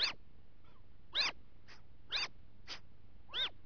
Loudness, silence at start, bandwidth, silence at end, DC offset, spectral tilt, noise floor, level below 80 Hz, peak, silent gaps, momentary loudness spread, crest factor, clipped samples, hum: -38 LUFS; 0 s; 5.4 kHz; 0.15 s; 0.4%; 2 dB/octave; -62 dBFS; -64 dBFS; -24 dBFS; none; 25 LU; 20 dB; under 0.1%; none